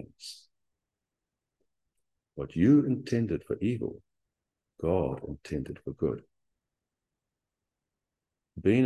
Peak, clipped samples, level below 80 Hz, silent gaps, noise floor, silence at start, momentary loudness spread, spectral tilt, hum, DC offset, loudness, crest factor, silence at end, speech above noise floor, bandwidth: -12 dBFS; under 0.1%; -54 dBFS; none; -88 dBFS; 0 s; 21 LU; -8 dB/octave; none; under 0.1%; -30 LUFS; 20 dB; 0 s; 60 dB; 12 kHz